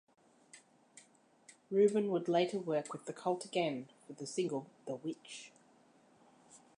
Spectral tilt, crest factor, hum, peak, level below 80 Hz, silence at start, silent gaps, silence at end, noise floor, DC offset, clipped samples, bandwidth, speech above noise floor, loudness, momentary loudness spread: -5.5 dB/octave; 20 dB; none; -18 dBFS; under -90 dBFS; 0.55 s; none; 0.2 s; -67 dBFS; under 0.1%; under 0.1%; 11 kHz; 31 dB; -36 LUFS; 17 LU